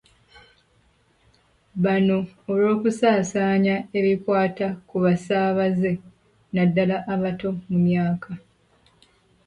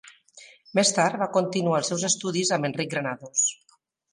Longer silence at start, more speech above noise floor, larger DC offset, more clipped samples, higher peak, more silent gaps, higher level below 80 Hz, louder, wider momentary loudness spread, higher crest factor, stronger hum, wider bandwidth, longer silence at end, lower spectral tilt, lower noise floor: first, 1.75 s vs 0.35 s; first, 40 dB vs 27 dB; neither; neither; about the same, -8 dBFS vs -8 dBFS; neither; first, -58 dBFS vs -74 dBFS; about the same, -22 LUFS vs -24 LUFS; first, 9 LU vs 6 LU; about the same, 16 dB vs 18 dB; neither; about the same, 10.5 kHz vs 11.5 kHz; first, 1.1 s vs 0.6 s; first, -7.5 dB/octave vs -3 dB/octave; first, -62 dBFS vs -52 dBFS